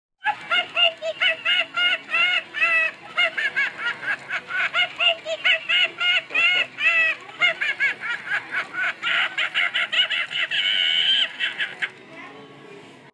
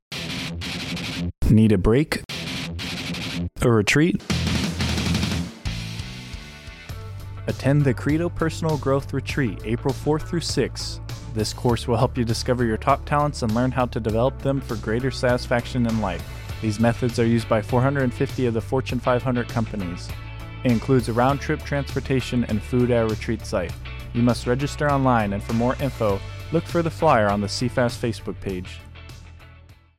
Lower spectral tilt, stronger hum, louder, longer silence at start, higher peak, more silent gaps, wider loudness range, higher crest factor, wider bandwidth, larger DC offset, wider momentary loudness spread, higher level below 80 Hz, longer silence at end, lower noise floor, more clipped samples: second, -0.5 dB/octave vs -6 dB/octave; neither; first, -20 LUFS vs -23 LUFS; first, 0.25 s vs 0.1 s; about the same, -6 dBFS vs -6 dBFS; neither; about the same, 2 LU vs 3 LU; about the same, 18 dB vs 16 dB; second, 11 kHz vs 16 kHz; neither; second, 9 LU vs 12 LU; second, -78 dBFS vs -38 dBFS; about the same, 0.2 s vs 0.25 s; second, -44 dBFS vs -48 dBFS; neither